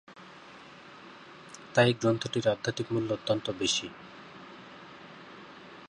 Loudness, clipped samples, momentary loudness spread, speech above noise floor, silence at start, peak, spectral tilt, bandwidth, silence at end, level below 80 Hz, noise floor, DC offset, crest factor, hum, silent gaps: -29 LUFS; under 0.1%; 24 LU; 22 dB; 0.1 s; -8 dBFS; -4.5 dB/octave; 11 kHz; 0 s; -66 dBFS; -50 dBFS; under 0.1%; 24 dB; none; none